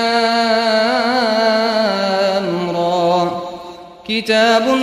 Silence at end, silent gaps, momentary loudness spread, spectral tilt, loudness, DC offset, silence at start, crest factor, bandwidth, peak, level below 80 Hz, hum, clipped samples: 0 s; none; 11 LU; -4.5 dB/octave; -15 LUFS; under 0.1%; 0 s; 14 dB; 15 kHz; 0 dBFS; -56 dBFS; none; under 0.1%